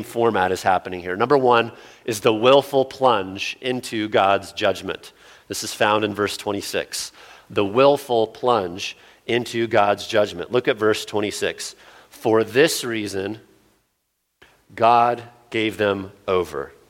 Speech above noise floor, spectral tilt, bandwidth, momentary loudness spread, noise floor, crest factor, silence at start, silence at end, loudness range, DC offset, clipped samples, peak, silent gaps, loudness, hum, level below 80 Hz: 52 dB; -4 dB/octave; 17 kHz; 12 LU; -73 dBFS; 20 dB; 0 s; 0.2 s; 4 LU; under 0.1%; under 0.1%; -2 dBFS; none; -21 LUFS; none; -60 dBFS